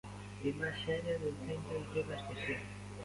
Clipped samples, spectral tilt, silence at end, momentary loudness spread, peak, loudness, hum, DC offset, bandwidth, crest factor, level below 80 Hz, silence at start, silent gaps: under 0.1%; -5.5 dB/octave; 0 s; 5 LU; -24 dBFS; -40 LUFS; 50 Hz at -50 dBFS; under 0.1%; 11.5 kHz; 16 dB; -58 dBFS; 0.05 s; none